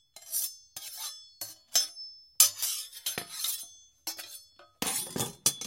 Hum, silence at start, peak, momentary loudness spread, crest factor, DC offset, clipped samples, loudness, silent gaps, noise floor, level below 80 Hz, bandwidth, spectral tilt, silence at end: none; 0.15 s; -4 dBFS; 20 LU; 30 dB; under 0.1%; under 0.1%; -30 LUFS; none; -52 dBFS; -70 dBFS; 17 kHz; 0 dB/octave; 0 s